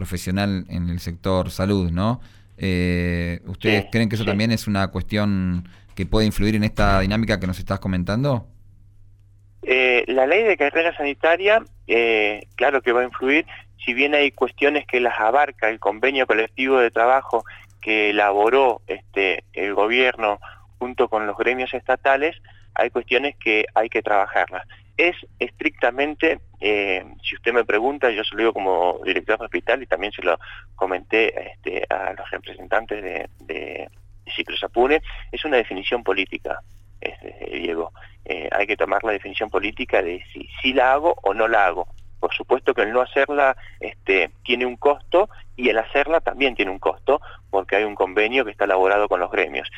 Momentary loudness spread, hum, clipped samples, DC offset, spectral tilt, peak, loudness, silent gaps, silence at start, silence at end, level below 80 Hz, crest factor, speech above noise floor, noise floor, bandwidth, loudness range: 12 LU; none; under 0.1%; under 0.1%; -6 dB/octave; -4 dBFS; -21 LUFS; none; 0 s; 0 s; -40 dBFS; 16 dB; 29 dB; -50 dBFS; 16 kHz; 5 LU